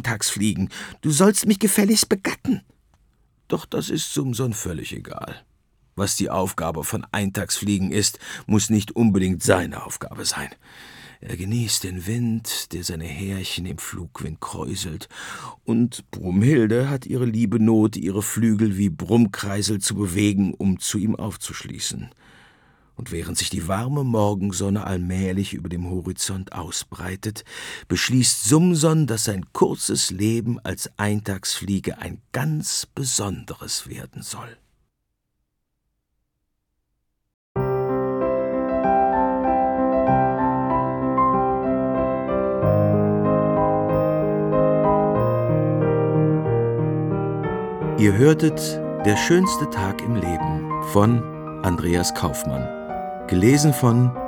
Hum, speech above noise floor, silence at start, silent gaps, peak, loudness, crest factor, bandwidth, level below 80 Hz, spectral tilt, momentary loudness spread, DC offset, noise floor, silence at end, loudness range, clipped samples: none; 54 dB; 0 s; 37.34-37.55 s; -2 dBFS; -22 LUFS; 20 dB; 20 kHz; -48 dBFS; -5 dB/octave; 14 LU; under 0.1%; -76 dBFS; 0 s; 8 LU; under 0.1%